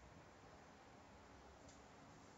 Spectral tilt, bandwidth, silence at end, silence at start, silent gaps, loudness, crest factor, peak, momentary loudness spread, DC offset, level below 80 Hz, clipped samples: -4 dB/octave; 7.6 kHz; 0 s; 0 s; none; -63 LUFS; 12 dB; -50 dBFS; 1 LU; under 0.1%; -74 dBFS; under 0.1%